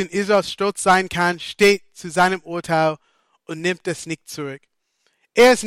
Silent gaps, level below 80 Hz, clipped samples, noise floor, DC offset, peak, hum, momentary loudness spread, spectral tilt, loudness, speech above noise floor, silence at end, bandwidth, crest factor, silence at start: none; -56 dBFS; under 0.1%; -68 dBFS; under 0.1%; -4 dBFS; none; 15 LU; -4 dB/octave; -19 LUFS; 49 dB; 0 s; 16 kHz; 16 dB; 0 s